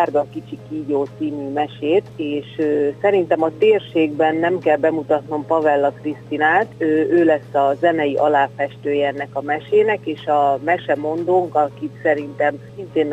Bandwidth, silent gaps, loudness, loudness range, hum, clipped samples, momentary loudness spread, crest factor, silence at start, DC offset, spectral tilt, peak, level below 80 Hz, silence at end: 8.4 kHz; none; -19 LUFS; 2 LU; none; under 0.1%; 8 LU; 16 dB; 0 s; under 0.1%; -7.5 dB/octave; -2 dBFS; -62 dBFS; 0 s